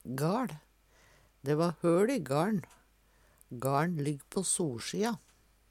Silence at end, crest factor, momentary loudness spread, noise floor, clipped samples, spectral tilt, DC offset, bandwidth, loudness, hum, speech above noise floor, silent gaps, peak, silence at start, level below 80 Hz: 0.55 s; 18 dB; 11 LU; -66 dBFS; under 0.1%; -5.5 dB/octave; under 0.1%; 16.5 kHz; -32 LUFS; none; 34 dB; none; -16 dBFS; 0.05 s; -68 dBFS